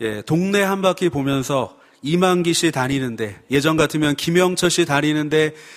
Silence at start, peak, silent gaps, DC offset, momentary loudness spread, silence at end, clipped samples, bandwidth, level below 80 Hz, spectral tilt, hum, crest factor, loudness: 0 s; 0 dBFS; none; under 0.1%; 6 LU; 0 s; under 0.1%; 15.5 kHz; -50 dBFS; -4.5 dB/octave; none; 18 dB; -19 LUFS